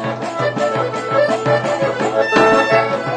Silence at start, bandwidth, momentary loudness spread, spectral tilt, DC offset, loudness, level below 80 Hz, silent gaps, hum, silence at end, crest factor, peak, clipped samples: 0 s; 10.5 kHz; 8 LU; -5.5 dB/octave; under 0.1%; -16 LUFS; -54 dBFS; none; none; 0 s; 16 dB; 0 dBFS; under 0.1%